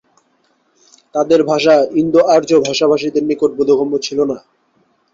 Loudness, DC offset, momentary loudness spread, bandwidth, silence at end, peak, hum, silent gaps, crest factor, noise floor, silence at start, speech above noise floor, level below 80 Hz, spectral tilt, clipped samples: -14 LUFS; under 0.1%; 8 LU; 7.6 kHz; 0.75 s; -2 dBFS; none; none; 14 dB; -60 dBFS; 1.15 s; 47 dB; -56 dBFS; -5 dB/octave; under 0.1%